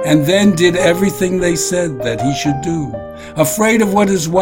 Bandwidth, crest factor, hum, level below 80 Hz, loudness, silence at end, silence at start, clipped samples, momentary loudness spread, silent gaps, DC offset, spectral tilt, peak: 16.5 kHz; 14 dB; none; -40 dBFS; -14 LUFS; 0 s; 0 s; under 0.1%; 9 LU; none; under 0.1%; -5 dB/octave; 0 dBFS